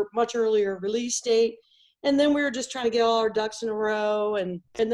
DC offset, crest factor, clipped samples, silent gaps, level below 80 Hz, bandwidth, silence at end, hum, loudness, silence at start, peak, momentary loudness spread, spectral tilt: under 0.1%; 14 dB; under 0.1%; none; -64 dBFS; 11.5 kHz; 0 s; none; -25 LUFS; 0 s; -10 dBFS; 7 LU; -3.5 dB/octave